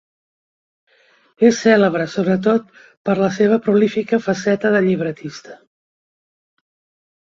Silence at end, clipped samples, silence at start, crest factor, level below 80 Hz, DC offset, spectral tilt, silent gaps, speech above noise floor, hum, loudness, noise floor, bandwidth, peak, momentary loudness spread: 1.75 s; under 0.1%; 1.4 s; 16 dB; -60 dBFS; under 0.1%; -6 dB/octave; 2.97-3.05 s; over 74 dB; none; -17 LUFS; under -90 dBFS; 7.6 kHz; -2 dBFS; 11 LU